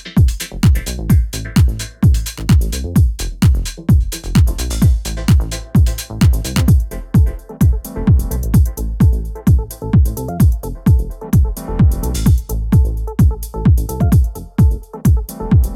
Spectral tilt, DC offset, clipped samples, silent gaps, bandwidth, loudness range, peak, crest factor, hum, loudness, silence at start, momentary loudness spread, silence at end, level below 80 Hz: -6.5 dB/octave; under 0.1%; under 0.1%; none; 17 kHz; 1 LU; -2 dBFS; 12 dB; none; -16 LUFS; 0.05 s; 3 LU; 0 s; -18 dBFS